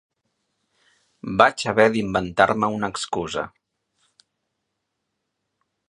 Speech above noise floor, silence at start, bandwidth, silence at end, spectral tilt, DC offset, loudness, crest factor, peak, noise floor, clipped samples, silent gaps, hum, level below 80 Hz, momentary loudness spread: 58 dB; 1.25 s; 11 kHz; 2.4 s; -4.5 dB/octave; under 0.1%; -21 LUFS; 24 dB; 0 dBFS; -78 dBFS; under 0.1%; none; none; -54 dBFS; 12 LU